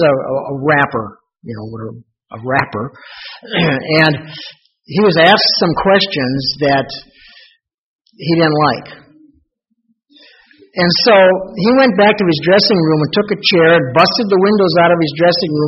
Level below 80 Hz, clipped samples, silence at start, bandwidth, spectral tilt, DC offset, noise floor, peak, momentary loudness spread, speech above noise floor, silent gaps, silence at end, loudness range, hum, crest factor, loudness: -50 dBFS; under 0.1%; 0 s; 6 kHz; -3.5 dB/octave; under 0.1%; -65 dBFS; 0 dBFS; 19 LU; 52 dB; 7.74-8.05 s; 0 s; 8 LU; none; 14 dB; -12 LUFS